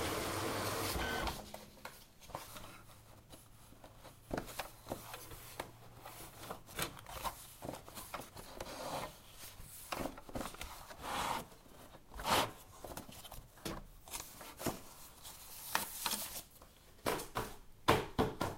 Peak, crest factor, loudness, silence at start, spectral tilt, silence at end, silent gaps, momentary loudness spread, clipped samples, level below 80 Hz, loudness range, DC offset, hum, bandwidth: -14 dBFS; 30 dB; -42 LUFS; 0 s; -3.5 dB/octave; 0 s; none; 20 LU; under 0.1%; -56 dBFS; 8 LU; under 0.1%; none; 16 kHz